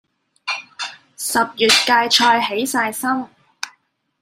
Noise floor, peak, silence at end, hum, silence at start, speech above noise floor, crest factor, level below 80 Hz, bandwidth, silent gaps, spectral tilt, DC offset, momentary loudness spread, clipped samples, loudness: -62 dBFS; 0 dBFS; 0.55 s; none; 0.45 s; 45 dB; 18 dB; -64 dBFS; 16 kHz; none; -1 dB/octave; under 0.1%; 19 LU; under 0.1%; -17 LUFS